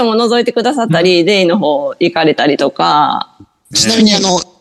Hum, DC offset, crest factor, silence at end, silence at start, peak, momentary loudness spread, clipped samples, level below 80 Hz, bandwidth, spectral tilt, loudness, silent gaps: none; under 0.1%; 12 dB; 0.15 s; 0 s; 0 dBFS; 6 LU; under 0.1%; -52 dBFS; 12.5 kHz; -4 dB/octave; -11 LUFS; none